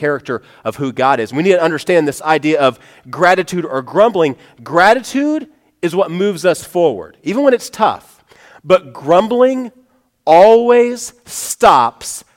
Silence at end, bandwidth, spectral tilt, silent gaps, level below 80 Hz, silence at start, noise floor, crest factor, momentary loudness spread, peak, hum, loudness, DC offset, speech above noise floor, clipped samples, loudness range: 0.15 s; 17 kHz; -4.5 dB/octave; none; -54 dBFS; 0 s; -45 dBFS; 14 dB; 14 LU; 0 dBFS; none; -13 LUFS; under 0.1%; 31 dB; under 0.1%; 4 LU